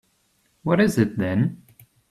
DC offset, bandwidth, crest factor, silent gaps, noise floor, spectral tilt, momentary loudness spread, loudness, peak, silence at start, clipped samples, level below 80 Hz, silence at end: under 0.1%; 14 kHz; 18 dB; none; -66 dBFS; -7 dB/octave; 7 LU; -22 LUFS; -6 dBFS; 0.65 s; under 0.1%; -56 dBFS; 0.55 s